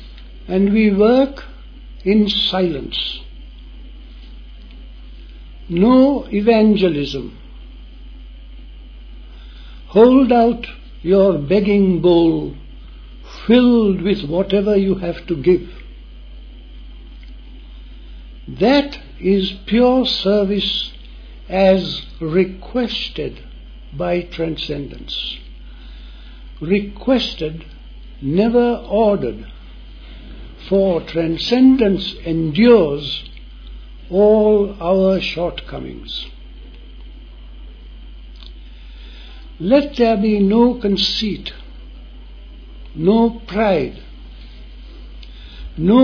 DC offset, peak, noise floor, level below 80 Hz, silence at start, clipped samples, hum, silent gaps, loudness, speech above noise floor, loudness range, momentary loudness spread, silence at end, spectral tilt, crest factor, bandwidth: under 0.1%; 0 dBFS; -36 dBFS; -36 dBFS; 0 s; under 0.1%; none; none; -16 LUFS; 21 dB; 9 LU; 25 LU; 0 s; -7.5 dB/octave; 18 dB; 5.4 kHz